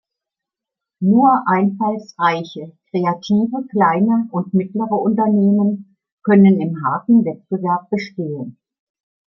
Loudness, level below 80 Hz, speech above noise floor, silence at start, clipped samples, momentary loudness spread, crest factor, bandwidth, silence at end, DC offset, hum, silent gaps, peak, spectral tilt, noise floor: -17 LUFS; -64 dBFS; 69 dB; 1 s; under 0.1%; 13 LU; 16 dB; 6 kHz; 0.8 s; under 0.1%; none; 6.12-6.18 s; -2 dBFS; -8.5 dB/octave; -85 dBFS